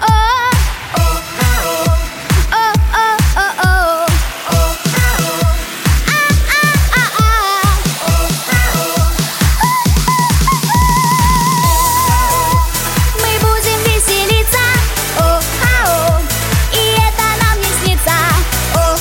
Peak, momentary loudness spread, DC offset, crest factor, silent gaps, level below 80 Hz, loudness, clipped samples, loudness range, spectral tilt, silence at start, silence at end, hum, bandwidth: 0 dBFS; 4 LU; under 0.1%; 12 dB; none; -18 dBFS; -12 LUFS; under 0.1%; 2 LU; -3.5 dB/octave; 0 s; 0 s; none; 17 kHz